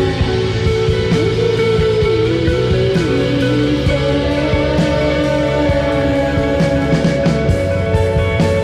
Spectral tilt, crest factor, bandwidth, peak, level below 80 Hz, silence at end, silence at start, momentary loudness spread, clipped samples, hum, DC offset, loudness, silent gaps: -7 dB/octave; 10 dB; 12.5 kHz; -4 dBFS; -26 dBFS; 0 s; 0 s; 2 LU; under 0.1%; none; under 0.1%; -15 LUFS; none